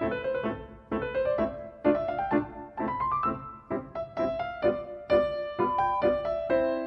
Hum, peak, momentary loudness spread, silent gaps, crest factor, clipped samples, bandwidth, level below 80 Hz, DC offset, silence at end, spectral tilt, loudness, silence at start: none; -12 dBFS; 10 LU; none; 18 dB; under 0.1%; 5.8 kHz; -52 dBFS; under 0.1%; 0 s; -8.5 dB/octave; -29 LUFS; 0 s